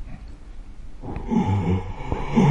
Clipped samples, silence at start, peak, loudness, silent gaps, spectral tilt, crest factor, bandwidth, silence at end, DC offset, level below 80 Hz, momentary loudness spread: under 0.1%; 0 s; -6 dBFS; -25 LUFS; none; -8.5 dB/octave; 18 dB; 9.2 kHz; 0 s; under 0.1%; -34 dBFS; 22 LU